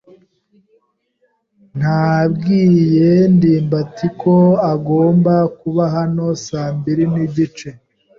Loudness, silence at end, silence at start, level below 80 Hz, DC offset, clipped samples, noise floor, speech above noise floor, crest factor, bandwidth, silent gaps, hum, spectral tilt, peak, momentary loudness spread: -15 LUFS; 0.45 s; 1.75 s; -52 dBFS; under 0.1%; under 0.1%; -63 dBFS; 50 dB; 12 dB; 7.2 kHz; none; none; -8.5 dB/octave; -2 dBFS; 10 LU